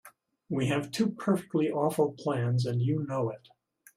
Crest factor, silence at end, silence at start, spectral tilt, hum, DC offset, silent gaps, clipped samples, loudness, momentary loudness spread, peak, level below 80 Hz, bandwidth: 18 dB; 0.6 s; 0.05 s; -7 dB/octave; none; under 0.1%; none; under 0.1%; -30 LUFS; 5 LU; -12 dBFS; -68 dBFS; 15 kHz